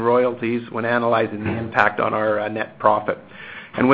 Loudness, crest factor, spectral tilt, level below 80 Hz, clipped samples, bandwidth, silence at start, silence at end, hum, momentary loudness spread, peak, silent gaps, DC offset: -21 LUFS; 20 dB; -8 dB/octave; -52 dBFS; under 0.1%; 7.2 kHz; 0 s; 0 s; none; 11 LU; 0 dBFS; none; under 0.1%